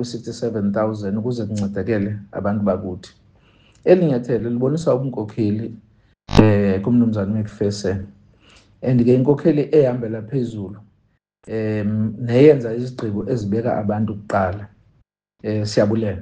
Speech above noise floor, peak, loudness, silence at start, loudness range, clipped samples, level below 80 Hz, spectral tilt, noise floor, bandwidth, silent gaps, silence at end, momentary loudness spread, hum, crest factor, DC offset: 45 dB; 0 dBFS; -19 LUFS; 0 s; 4 LU; under 0.1%; -44 dBFS; -8 dB/octave; -63 dBFS; 9.2 kHz; none; 0 s; 11 LU; none; 20 dB; under 0.1%